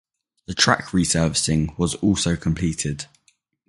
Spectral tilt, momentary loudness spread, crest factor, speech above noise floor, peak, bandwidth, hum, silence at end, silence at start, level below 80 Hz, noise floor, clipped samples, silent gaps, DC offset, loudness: -4 dB/octave; 10 LU; 22 dB; 43 dB; 0 dBFS; 11.5 kHz; none; 0.65 s; 0.5 s; -40 dBFS; -64 dBFS; under 0.1%; none; under 0.1%; -21 LUFS